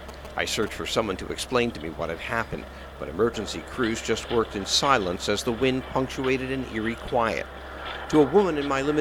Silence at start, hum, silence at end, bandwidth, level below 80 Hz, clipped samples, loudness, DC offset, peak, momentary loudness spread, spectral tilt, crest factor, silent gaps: 0 s; none; 0 s; 17 kHz; -44 dBFS; under 0.1%; -26 LUFS; under 0.1%; -4 dBFS; 13 LU; -4 dB/octave; 22 dB; none